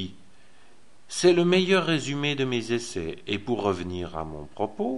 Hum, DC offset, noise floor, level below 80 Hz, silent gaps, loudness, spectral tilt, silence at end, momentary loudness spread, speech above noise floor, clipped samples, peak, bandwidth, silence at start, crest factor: none; 0.6%; -59 dBFS; -52 dBFS; none; -26 LUFS; -5 dB/octave; 0 s; 14 LU; 34 dB; under 0.1%; -6 dBFS; 11.5 kHz; 0 s; 20 dB